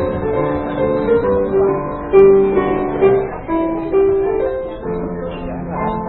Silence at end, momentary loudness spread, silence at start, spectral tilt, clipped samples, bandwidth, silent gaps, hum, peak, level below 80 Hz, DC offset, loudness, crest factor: 0 s; 13 LU; 0 s; -11.5 dB/octave; under 0.1%; 4.2 kHz; none; none; 0 dBFS; -36 dBFS; under 0.1%; -16 LUFS; 16 dB